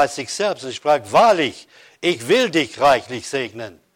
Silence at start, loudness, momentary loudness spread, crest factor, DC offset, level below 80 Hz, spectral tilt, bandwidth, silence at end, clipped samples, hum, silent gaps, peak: 0 s; -18 LUFS; 11 LU; 14 dB; under 0.1%; -58 dBFS; -3.5 dB/octave; 16.5 kHz; 0.25 s; under 0.1%; none; none; -6 dBFS